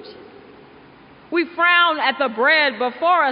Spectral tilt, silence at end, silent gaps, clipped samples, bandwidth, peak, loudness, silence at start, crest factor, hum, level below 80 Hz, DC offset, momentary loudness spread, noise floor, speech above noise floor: 1.5 dB/octave; 0 s; none; under 0.1%; 5.2 kHz; -4 dBFS; -17 LUFS; 0 s; 16 dB; none; -68 dBFS; under 0.1%; 9 LU; -46 dBFS; 28 dB